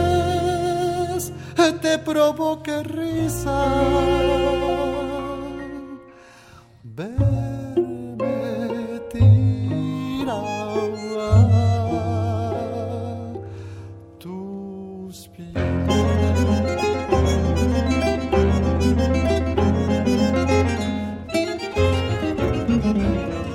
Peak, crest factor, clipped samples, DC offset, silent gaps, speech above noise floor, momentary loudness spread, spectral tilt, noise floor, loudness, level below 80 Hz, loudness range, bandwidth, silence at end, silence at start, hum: -4 dBFS; 18 dB; under 0.1%; under 0.1%; none; 27 dB; 14 LU; -6.5 dB/octave; -47 dBFS; -21 LUFS; -34 dBFS; 7 LU; 16 kHz; 0 s; 0 s; none